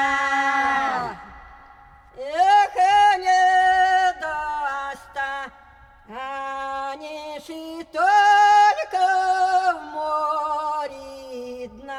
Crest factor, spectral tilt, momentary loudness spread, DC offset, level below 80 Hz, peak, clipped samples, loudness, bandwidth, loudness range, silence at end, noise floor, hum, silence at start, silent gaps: 14 dB; -2 dB/octave; 19 LU; under 0.1%; -56 dBFS; -8 dBFS; under 0.1%; -20 LUFS; 11.5 kHz; 10 LU; 0 s; -49 dBFS; none; 0 s; none